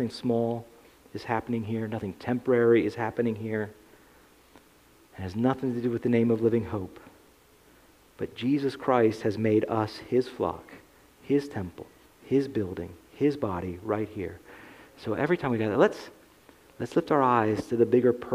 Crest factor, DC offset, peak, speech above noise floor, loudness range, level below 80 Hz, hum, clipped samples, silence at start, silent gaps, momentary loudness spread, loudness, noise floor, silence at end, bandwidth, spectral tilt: 22 dB; under 0.1%; -6 dBFS; 32 dB; 4 LU; -62 dBFS; none; under 0.1%; 0 s; none; 16 LU; -27 LUFS; -58 dBFS; 0 s; 15.5 kHz; -7.5 dB/octave